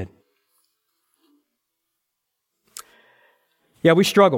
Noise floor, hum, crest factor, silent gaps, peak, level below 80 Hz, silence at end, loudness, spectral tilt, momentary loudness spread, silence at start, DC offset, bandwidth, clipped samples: -79 dBFS; none; 22 dB; none; -2 dBFS; -64 dBFS; 0 s; -17 LUFS; -5 dB/octave; 26 LU; 0 s; under 0.1%; 17 kHz; under 0.1%